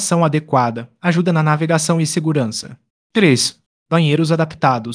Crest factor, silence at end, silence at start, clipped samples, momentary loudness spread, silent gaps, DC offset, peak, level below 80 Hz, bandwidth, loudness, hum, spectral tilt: 16 dB; 0 s; 0 s; under 0.1%; 8 LU; 2.90-3.10 s, 3.66-3.86 s; under 0.1%; 0 dBFS; -60 dBFS; 10.5 kHz; -16 LUFS; none; -5 dB/octave